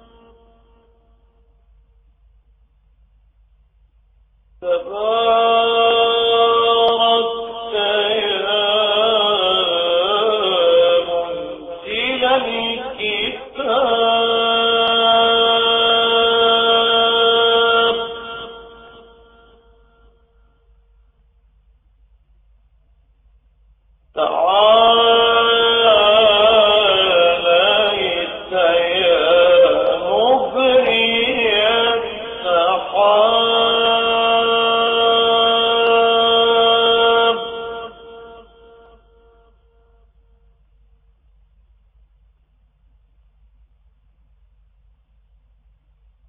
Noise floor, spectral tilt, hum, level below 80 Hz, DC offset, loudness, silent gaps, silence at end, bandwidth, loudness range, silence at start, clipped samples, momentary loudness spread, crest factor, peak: -57 dBFS; -4.5 dB/octave; none; -52 dBFS; under 0.1%; -14 LUFS; none; 7.9 s; 8.2 kHz; 7 LU; 4.6 s; under 0.1%; 11 LU; 16 dB; -2 dBFS